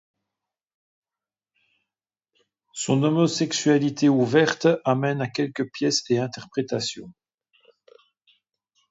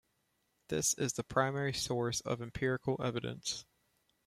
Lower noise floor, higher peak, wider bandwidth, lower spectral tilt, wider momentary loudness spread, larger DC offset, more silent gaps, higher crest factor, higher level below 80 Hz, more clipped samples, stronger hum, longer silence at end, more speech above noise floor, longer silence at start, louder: first, under -90 dBFS vs -79 dBFS; first, -6 dBFS vs -14 dBFS; second, 8 kHz vs 16 kHz; first, -5 dB/octave vs -3.5 dB/octave; first, 10 LU vs 7 LU; neither; neither; about the same, 20 dB vs 22 dB; second, -70 dBFS vs -62 dBFS; neither; neither; first, 1.8 s vs 0.65 s; first, over 68 dB vs 43 dB; first, 2.75 s vs 0.7 s; first, -23 LUFS vs -35 LUFS